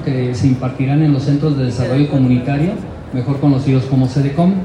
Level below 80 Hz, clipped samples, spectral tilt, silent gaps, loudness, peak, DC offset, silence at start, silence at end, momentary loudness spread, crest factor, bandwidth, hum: -40 dBFS; under 0.1%; -8.5 dB/octave; none; -15 LUFS; -2 dBFS; under 0.1%; 0 s; 0 s; 6 LU; 14 dB; 9.4 kHz; none